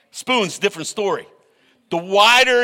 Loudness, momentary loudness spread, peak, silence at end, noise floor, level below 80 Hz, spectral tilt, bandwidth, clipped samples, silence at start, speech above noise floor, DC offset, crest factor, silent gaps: -17 LUFS; 16 LU; -2 dBFS; 0 s; -58 dBFS; -60 dBFS; -2 dB/octave; 17 kHz; under 0.1%; 0.15 s; 41 dB; under 0.1%; 16 dB; none